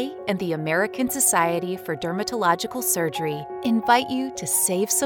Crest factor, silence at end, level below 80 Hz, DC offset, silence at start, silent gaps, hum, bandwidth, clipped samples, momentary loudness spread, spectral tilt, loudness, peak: 18 dB; 0 s; -62 dBFS; under 0.1%; 0 s; none; none; over 20 kHz; under 0.1%; 9 LU; -3 dB/octave; -22 LUFS; -4 dBFS